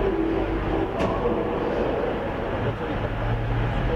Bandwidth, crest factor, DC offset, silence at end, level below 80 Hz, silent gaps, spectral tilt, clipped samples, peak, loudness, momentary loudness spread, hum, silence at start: 8 kHz; 12 dB; under 0.1%; 0 s; -32 dBFS; none; -8 dB/octave; under 0.1%; -12 dBFS; -26 LUFS; 3 LU; none; 0 s